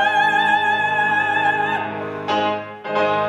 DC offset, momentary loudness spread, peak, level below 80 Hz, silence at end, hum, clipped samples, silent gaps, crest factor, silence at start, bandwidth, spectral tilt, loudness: under 0.1%; 9 LU; -4 dBFS; -66 dBFS; 0 s; none; under 0.1%; none; 14 dB; 0 s; 11.5 kHz; -4.5 dB/octave; -19 LUFS